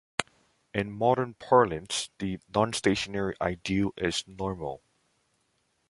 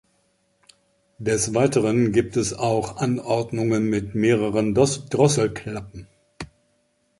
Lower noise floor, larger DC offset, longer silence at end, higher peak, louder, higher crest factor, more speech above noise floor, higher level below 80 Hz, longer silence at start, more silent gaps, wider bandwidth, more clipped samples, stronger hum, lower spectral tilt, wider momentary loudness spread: first, -73 dBFS vs -67 dBFS; neither; first, 1.15 s vs 0.75 s; first, 0 dBFS vs -4 dBFS; second, -29 LUFS vs -22 LUFS; first, 28 dB vs 20 dB; about the same, 45 dB vs 46 dB; about the same, -54 dBFS vs -50 dBFS; second, 0.2 s vs 1.2 s; neither; about the same, 11.5 kHz vs 11.5 kHz; neither; neither; about the same, -4.5 dB/octave vs -5.5 dB/octave; second, 12 LU vs 15 LU